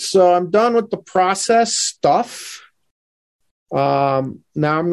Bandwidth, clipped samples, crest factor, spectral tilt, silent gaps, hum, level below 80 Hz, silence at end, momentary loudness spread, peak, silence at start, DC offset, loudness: 12.5 kHz; under 0.1%; 14 dB; -4 dB/octave; 2.91-3.40 s, 3.51-3.66 s; none; -60 dBFS; 0 s; 13 LU; -4 dBFS; 0 s; under 0.1%; -17 LUFS